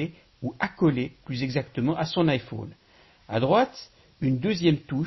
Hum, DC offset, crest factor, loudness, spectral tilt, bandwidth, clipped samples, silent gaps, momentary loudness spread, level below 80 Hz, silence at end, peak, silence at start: none; under 0.1%; 18 dB; -26 LUFS; -7 dB/octave; 6.2 kHz; under 0.1%; none; 14 LU; -56 dBFS; 0 s; -10 dBFS; 0 s